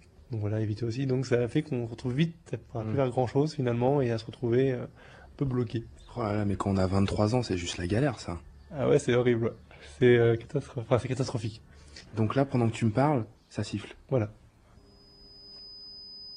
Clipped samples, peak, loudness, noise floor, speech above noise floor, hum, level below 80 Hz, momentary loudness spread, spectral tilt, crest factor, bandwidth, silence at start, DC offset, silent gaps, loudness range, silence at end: under 0.1%; -8 dBFS; -29 LUFS; -57 dBFS; 29 dB; none; -54 dBFS; 17 LU; -7 dB/octave; 20 dB; 10.5 kHz; 0.3 s; under 0.1%; none; 3 LU; 0 s